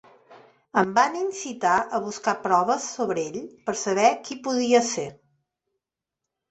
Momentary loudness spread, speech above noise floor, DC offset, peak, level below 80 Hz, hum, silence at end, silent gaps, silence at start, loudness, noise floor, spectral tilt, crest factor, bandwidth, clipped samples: 10 LU; 63 dB; under 0.1%; -4 dBFS; -68 dBFS; none; 1.4 s; none; 0.3 s; -24 LUFS; -86 dBFS; -3.5 dB/octave; 20 dB; 8.2 kHz; under 0.1%